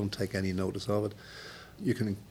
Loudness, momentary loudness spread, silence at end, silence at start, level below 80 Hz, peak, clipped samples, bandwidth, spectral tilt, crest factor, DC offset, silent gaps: -33 LUFS; 14 LU; 0 s; 0 s; -60 dBFS; -18 dBFS; under 0.1%; 16.5 kHz; -6.5 dB/octave; 16 dB; under 0.1%; none